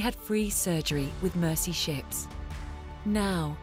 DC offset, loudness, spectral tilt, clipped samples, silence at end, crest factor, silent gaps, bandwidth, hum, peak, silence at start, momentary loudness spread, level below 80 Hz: under 0.1%; -30 LUFS; -4 dB/octave; under 0.1%; 0 s; 14 dB; none; 16.5 kHz; none; -16 dBFS; 0 s; 13 LU; -42 dBFS